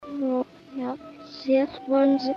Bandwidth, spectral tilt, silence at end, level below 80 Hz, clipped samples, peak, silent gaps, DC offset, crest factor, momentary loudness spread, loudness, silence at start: 6.6 kHz; -6.5 dB/octave; 0 s; -66 dBFS; under 0.1%; -10 dBFS; none; under 0.1%; 14 dB; 14 LU; -26 LUFS; 0 s